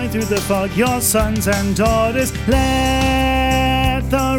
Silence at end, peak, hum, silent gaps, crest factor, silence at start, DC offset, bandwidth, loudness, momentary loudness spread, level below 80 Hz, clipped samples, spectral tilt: 0 s; -2 dBFS; none; none; 14 dB; 0 s; under 0.1%; 19.5 kHz; -16 LUFS; 3 LU; -24 dBFS; under 0.1%; -4.5 dB/octave